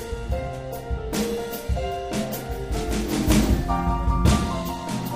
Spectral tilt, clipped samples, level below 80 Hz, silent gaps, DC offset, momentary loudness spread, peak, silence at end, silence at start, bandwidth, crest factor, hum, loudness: -5.5 dB/octave; under 0.1%; -28 dBFS; none; under 0.1%; 9 LU; -6 dBFS; 0 s; 0 s; 16 kHz; 18 dB; none; -25 LUFS